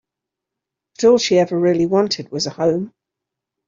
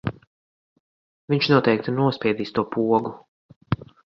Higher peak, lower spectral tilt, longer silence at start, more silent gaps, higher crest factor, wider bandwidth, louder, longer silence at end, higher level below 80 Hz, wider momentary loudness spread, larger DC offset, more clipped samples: about the same, -2 dBFS vs -2 dBFS; second, -5 dB/octave vs -8 dB/octave; first, 1 s vs 0.05 s; second, none vs 0.27-1.28 s, 3.28-3.49 s, 3.56-3.61 s; second, 16 dB vs 22 dB; first, 7.6 kHz vs 6.6 kHz; first, -17 LUFS vs -22 LUFS; first, 0.8 s vs 0.4 s; about the same, -58 dBFS vs -54 dBFS; second, 9 LU vs 12 LU; neither; neither